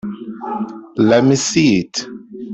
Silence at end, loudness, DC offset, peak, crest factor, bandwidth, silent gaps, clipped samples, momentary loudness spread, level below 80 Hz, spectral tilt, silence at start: 0 s; -16 LUFS; under 0.1%; -2 dBFS; 14 dB; 8.4 kHz; none; under 0.1%; 16 LU; -54 dBFS; -5 dB/octave; 0.05 s